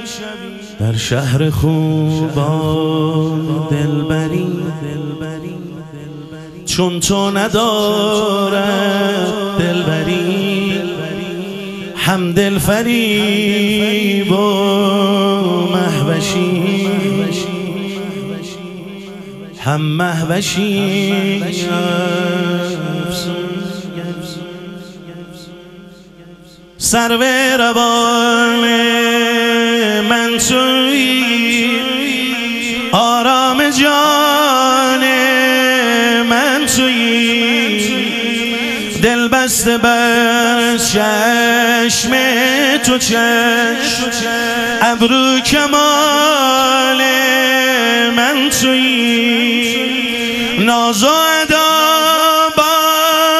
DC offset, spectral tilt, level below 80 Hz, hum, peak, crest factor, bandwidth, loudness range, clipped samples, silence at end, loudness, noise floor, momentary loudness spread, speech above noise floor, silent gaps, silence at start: under 0.1%; -3.5 dB/octave; -44 dBFS; none; 0 dBFS; 14 dB; 15.5 kHz; 9 LU; under 0.1%; 0 s; -13 LUFS; -39 dBFS; 13 LU; 26 dB; none; 0 s